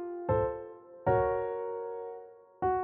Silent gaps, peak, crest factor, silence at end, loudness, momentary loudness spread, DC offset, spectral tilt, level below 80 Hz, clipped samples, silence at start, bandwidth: none; -16 dBFS; 16 dB; 0 s; -33 LUFS; 15 LU; under 0.1%; -8.5 dB/octave; -54 dBFS; under 0.1%; 0 s; 3.6 kHz